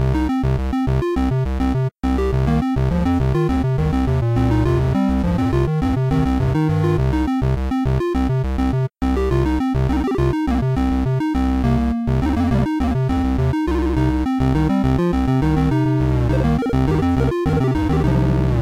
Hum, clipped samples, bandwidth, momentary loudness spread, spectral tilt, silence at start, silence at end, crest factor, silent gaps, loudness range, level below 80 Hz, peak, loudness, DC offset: none; under 0.1%; 10.5 kHz; 3 LU; -8.5 dB/octave; 0 s; 0 s; 8 dB; none; 2 LU; -24 dBFS; -8 dBFS; -19 LUFS; 0.2%